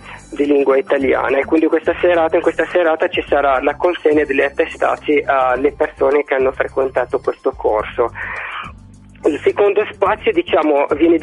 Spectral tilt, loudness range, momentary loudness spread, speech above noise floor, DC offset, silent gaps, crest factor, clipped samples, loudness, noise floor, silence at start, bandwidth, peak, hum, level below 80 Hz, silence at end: -6 dB/octave; 4 LU; 6 LU; 25 dB; under 0.1%; none; 14 dB; under 0.1%; -16 LUFS; -40 dBFS; 0 s; 11 kHz; 0 dBFS; none; -44 dBFS; 0 s